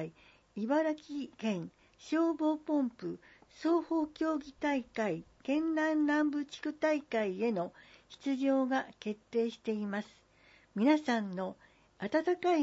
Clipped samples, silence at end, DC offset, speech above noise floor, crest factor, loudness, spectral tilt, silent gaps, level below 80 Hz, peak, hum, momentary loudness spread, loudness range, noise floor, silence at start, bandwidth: under 0.1%; 0 s; under 0.1%; 31 dB; 16 dB; -34 LUFS; -6 dB/octave; none; -72 dBFS; -16 dBFS; none; 12 LU; 2 LU; -64 dBFS; 0 s; 8 kHz